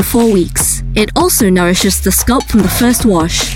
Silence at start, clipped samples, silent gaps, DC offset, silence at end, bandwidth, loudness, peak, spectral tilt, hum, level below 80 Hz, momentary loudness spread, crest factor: 0 s; under 0.1%; none; under 0.1%; 0 s; 17 kHz; -11 LUFS; 0 dBFS; -4 dB/octave; none; -24 dBFS; 3 LU; 10 dB